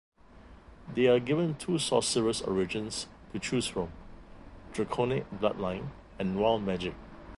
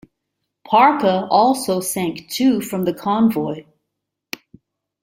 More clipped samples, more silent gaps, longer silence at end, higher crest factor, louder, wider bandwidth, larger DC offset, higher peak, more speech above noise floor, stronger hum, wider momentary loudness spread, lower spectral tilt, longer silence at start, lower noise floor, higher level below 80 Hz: neither; neither; second, 0 s vs 1.4 s; about the same, 20 dB vs 18 dB; second, -31 LUFS vs -18 LUFS; second, 11.5 kHz vs 16.5 kHz; neither; second, -10 dBFS vs -2 dBFS; second, 23 dB vs 62 dB; neither; second, 13 LU vs 19 LU; about the same, -5 dB/octave vs -5 dB/octave; second, 0.35 s vs 0.7 s; second, -53 dBFS vs -79 dBFS; first, -54 dBFS vs -60 dBFS